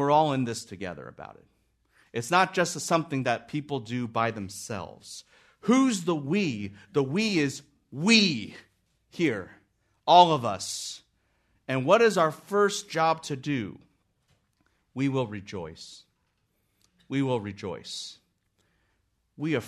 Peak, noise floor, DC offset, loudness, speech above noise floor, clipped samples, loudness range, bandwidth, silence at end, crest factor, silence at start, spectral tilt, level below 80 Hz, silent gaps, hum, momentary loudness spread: -4 dBFS; -74 dBFS; under 0.1%; -26 LUFS; 47 dB; under 0.1%; 11 LU; 13.5 kHz; 0 s; 24 dB; 0 s; -4.5 dB/octave; -70 dBFS; none; none; 21 LU